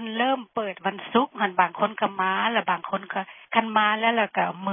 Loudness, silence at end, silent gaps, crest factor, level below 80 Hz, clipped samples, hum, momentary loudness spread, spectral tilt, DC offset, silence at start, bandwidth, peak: -24 LUFS; 0 s; none; 20 dB; -76 dBFS; under 0.1%; none; 8 LU; -9 dB/octave; under 0.1%; 0 s; 3.7 kHz; -4 dBFS